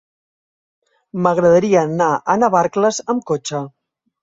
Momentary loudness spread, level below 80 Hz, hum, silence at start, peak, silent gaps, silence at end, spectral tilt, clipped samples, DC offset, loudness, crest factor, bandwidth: 13 LU; -58 dBFS; none; 1.15 s; -2 dBFS; none; 0.55 s; -5.5 dB/octave; under 0.1%; under 0.1%; -16 LUFS; 16 dB; 7.8 kHz